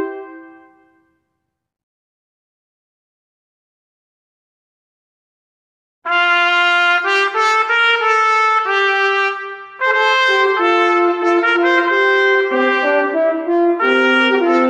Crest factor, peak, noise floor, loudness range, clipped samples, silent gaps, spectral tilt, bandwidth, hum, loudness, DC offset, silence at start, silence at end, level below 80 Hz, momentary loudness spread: 16 dB; -2 dBFS; -75 dBFS; 4 LU; under 0.1%; 1.83-6.02 s; -1.5 dB/octave; 9.6 kHz; none; -13 LUFS; under 0.1%; 0 s; 0 s; -74 dBFS; 5 LU